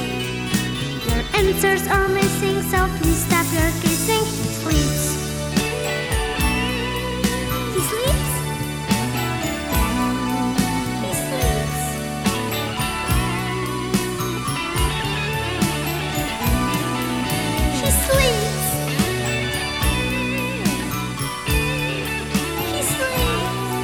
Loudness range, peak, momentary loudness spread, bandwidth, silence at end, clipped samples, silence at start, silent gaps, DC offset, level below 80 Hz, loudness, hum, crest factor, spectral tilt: 3 LU; -4 dBFS; 5 LU; over 20 kHz; 0 s; under 0.1%; 0 s; none; 0.2%; -30 dBFS; -21 LUFS; none; 18 dB; -4 dB/octave